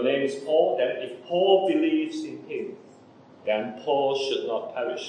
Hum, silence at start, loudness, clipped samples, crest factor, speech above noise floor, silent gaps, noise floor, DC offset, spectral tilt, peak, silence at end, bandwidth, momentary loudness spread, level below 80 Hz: none; 0 s; -25 LUFS; under 0.1%; 18 dB; 26 dB; none; -51 dBFS; under 0.1%; -5 dB/octave; -6 dBFS; 0 s; 9.8 kHz; 13 LU; -88 dBFS